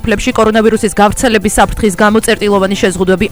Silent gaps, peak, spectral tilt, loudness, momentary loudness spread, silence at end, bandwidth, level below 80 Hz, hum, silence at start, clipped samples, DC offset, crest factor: none; 0 dBFS; -4.5 dB/octave; -10 LUFS; 3 LU; 0 s; over 20 kHz; -26 dBFS; none; 0.05 s; 0.4%; 2%; 10 dB